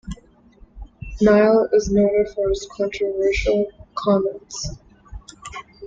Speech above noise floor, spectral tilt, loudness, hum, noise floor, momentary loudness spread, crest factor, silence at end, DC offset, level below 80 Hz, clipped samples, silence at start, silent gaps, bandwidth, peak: 31 dB; -5.5 dB/octave; -19 LUFS; none; -50 dBFS; 22 LU; 18 dB; 0 s; under 0.1%; -38 dBFS; under 0.1%; 0.05 s; none; 7.8 kHz; -4 dBFS